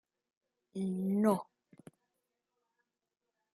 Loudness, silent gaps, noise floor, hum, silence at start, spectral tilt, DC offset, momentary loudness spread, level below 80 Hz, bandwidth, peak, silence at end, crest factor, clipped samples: -34 LUFS; none; -89 dBFS; none; 0.75 s; -8 dB/octave; under 0.1%; 17 LU; -82 dBFS; 13 kHz; -16 dBFS; 2.1 s; 24 dB; under 0.1%